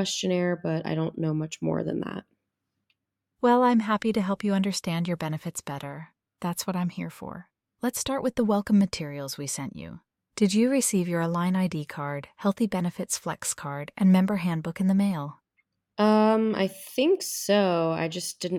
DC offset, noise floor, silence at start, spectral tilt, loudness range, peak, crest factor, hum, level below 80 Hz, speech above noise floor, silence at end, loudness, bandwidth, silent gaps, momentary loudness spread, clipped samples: under 0.1%; -82 dBFS; 0 s; -5.5 dB/octave; 5 LU; -10 dBFS; 18 dB; none; -64 dBFS; 56 dB; 0 s; -26 LUFS; 17 kHz; none; 14 LU; under 0.1%